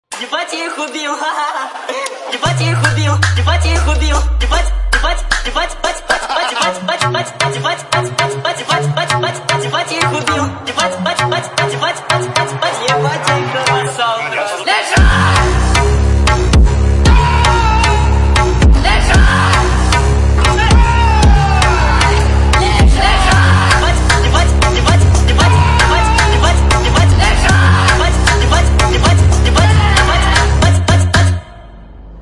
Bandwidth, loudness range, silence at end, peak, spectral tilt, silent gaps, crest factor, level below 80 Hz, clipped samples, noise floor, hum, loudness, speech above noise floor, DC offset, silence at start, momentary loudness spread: 11.5 kHz; 5 LU; 0 s; 0 dBFS; -4.5 dB/octave; none; 10 dB; -16 dBFS; under 0.1%; -33 dBFS; none; -12 LUFS; 18 dB; under 0.1%; 0.1 s; 7 LU